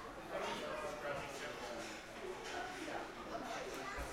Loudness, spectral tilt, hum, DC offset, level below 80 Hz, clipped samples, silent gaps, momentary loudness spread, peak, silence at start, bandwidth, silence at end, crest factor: -45 LUFS; -3.5 dB/octave; none; under 0.1%; -62 dBFS; under 0.1%; none; 4 LU; -30 dBFS; 0 s; 16 kHz; 0 s; 16 dB